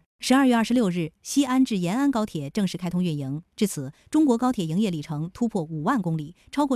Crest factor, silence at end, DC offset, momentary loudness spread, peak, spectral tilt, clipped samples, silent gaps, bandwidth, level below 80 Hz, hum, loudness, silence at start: 18 dB; 0 s; under 0.1%; 10 LU; -6 dBFS; -5.5 dB/octave; under 0.1%; none; 15 kHz; -58 dBFS; none; -25 LUFS; 0.2 s